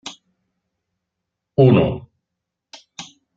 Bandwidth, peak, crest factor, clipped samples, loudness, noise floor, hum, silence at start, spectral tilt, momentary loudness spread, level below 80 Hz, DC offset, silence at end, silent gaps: 7.6 kHz; -2 dBFS; 20 dB; under 0.1%; -16 LUFS; -81 dBFS; none; 0.05 s; -7.5 dB/octave; 24 LU; -50 dBFS; under 0.1%; 0.35 s; none